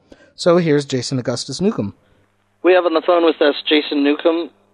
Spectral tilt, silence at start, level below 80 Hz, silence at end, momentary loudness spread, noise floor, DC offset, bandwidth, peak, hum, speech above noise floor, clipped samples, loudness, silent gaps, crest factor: -5.5 dB/octave; 0.4 s; -60 dBFS; 0.25 s; 8 LU; -59 dBFS; under 0.1%; 11 kHz; -2 dBFS; none; 43 dB; under 0.1%; -17 LUFS; none; 14 dB